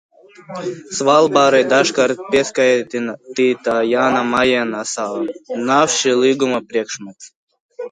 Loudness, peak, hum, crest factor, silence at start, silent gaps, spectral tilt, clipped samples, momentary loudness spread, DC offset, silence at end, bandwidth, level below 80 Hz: -16 LUFS; 0 dBFS; none; 16 dB; 0.4 s; 7.36-7.47 s, 7.60-7.69 s; -3 dB/octave; under 0.1%; 14 LU; under 0.1%; 0.05 s; 10.5 kHz; -58 dBFS